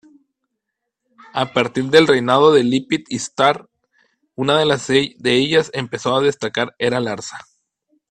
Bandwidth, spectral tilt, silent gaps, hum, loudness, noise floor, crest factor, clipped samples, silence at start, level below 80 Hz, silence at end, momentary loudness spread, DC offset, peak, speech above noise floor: 10 kHz; -4.5 dB/octave; none; none; -17 LUFS; -79 dBFS; 18 dB; under 0.1%; 1.35 s; -58 dBFS; 0.7 s; 13 LU; under 0.1%; 0 dBFS; 62 dB